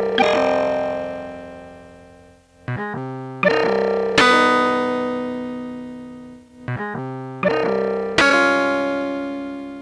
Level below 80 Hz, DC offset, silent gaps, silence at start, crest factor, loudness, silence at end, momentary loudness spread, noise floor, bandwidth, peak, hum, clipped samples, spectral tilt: -54 dBFS; under 0.1%; none; 0 s; 20 dB; -19 LUFS; 0 s; 20 LU; -49 dBFS; 11 kHz; 0 dBFS; none; under 0.1%; -4.5 dB/octave